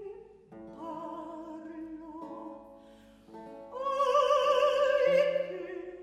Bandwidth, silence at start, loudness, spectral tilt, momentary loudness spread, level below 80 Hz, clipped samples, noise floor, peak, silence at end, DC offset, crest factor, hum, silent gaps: 11 kHz; 0 s; -28 LUFS; -4 dB/octave; 23 LU; -68 dBFS; under 0.1%; -56 dBFS; -14 dBFS; 0 s; under 0.1%; 18 dB; none; none